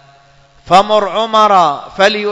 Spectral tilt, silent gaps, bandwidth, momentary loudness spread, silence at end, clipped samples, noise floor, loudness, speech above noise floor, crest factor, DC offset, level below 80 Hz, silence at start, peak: -4 dB/octave; none; 11 kHz; 4 LU; 0 s; 1%; -46 dBFS; -11 LUFS; 35 dB; 12 dB; under 0.1%; -48 dBFS; 0.65 s; 0 dBFS